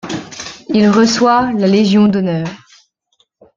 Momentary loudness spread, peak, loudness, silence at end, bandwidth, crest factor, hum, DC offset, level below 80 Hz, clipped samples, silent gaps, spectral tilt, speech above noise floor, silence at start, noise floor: 15 LU; -2 dBFS; -12 LUFS; 1 s; 7.6 kHz; 12 dB; none; under 0.1%; -52 dBFS; under 0.1%; none; -5.5 dB/octave; 49 dB; 0.05 s; -61 dBFS